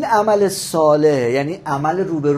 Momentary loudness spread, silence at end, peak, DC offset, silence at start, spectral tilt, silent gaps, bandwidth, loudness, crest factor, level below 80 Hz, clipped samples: 7 LU; 0 s; -2 dBFS; under 0.1%; 0 s; -5.5 dB/octave; none; 15.5 kHz; -17 LUFS; 14 dB; -56 dBFS; under 0.1%